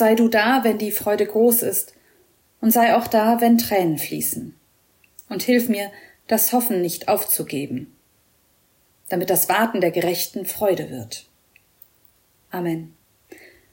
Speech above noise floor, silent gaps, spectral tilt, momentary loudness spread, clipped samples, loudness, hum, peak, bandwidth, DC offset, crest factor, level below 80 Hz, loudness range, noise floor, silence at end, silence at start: 42 dB; none; -4 dB/octave; 15 LU; under 0.1%; -20 LUFS; none; -8 dBFS; 16.5 kHz; under 0.1%; 14 dB; -64 dBFS; 6 LU; -61 dBFS; 0.85 s; 0 s